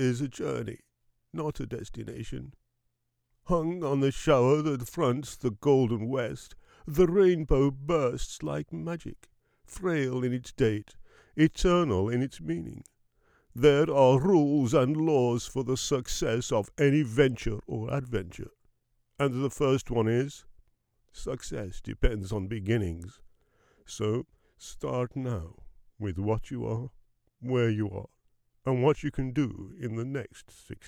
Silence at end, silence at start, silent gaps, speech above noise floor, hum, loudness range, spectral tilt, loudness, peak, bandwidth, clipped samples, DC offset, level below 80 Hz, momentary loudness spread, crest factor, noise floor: 0 s; 0 s; none; 50 dB; none; 9 LU; -6.5 dB/octave; -28 LUFS; -8 dBFS; 16.5 kHz; under 0.1%; under 0.1%; -44 dBFS; 17 LU; 20 dB; -78 dBFS